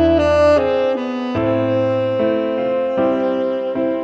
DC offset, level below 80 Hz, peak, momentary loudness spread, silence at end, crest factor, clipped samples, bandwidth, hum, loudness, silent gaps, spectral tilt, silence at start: under 0.1%; -40 dBFS; -4 dBFS; 7 LU; 0 s; 14 dB; under 0.1%; 8.2 kHz; none; -17 LUFS; none; -7.5 dB/octave; 0 s